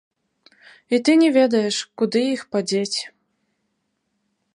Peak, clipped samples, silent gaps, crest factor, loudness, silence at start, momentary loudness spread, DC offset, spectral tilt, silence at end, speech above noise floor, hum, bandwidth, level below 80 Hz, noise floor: -4 dBFS; under 0.1%; none; 18 dB; -20 LUFS; 0.9 s; 10 LU; under 0.1%; -4 dB/octave; 1.5 s; 54 dB; none; 11 kHz; -76 dBFS; -73 dBFS